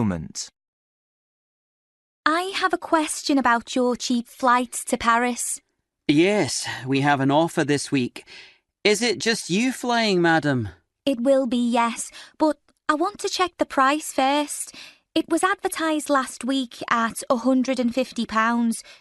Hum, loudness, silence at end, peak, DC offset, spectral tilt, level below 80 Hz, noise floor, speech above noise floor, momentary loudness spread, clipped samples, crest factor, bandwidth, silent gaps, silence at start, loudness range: none; -22 LUFS; 0.05 s; -2 dBFS; under 0.1%; -4 dB/octave; -58 dBFS; under -90 dBFS; over 68 dB; 8 LU; under 0.1%; 20 dB; 12.5 kHz; 0.68-2.23 s; 0 s; 2 LU